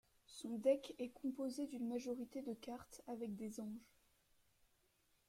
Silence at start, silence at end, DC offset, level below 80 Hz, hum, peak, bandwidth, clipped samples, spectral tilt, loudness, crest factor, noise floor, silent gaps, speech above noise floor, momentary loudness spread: 0.3 s; 1.45 s; under 0.1%; -80 dBFS; none; -24 dBFS; 16 kHz; under 0.1%; -5.5 dB/octave; -45 LUFS; 22 dB; -79 dBFS; none; 34 dB; 14 LU